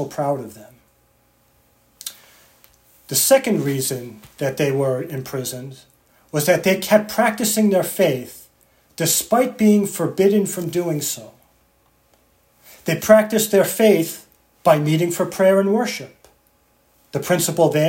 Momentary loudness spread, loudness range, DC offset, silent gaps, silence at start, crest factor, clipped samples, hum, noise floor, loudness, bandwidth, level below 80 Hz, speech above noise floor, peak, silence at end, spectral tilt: 15 LU; 5 LU; under 0.1%; none; 0 s; 20 dB; under 0.1%; 60 Hz at -60 dBFS; -60 dBFS; -18 LUFS; 17 kHz; -62 dBFS; 42 dB; 0 dBFS; 0 s; -4.5 dB/octave